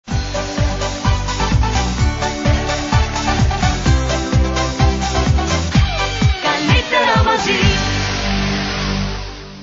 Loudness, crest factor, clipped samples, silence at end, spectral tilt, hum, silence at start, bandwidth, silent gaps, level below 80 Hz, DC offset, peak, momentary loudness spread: -17 LUFS; 16 dB; under 0.1%; 0 s; -4.5 dB/octave; none; 0.05 s; 7.8 kHz; none; -22 dBFS; under 0.1%; 0 dBFS; 6 LU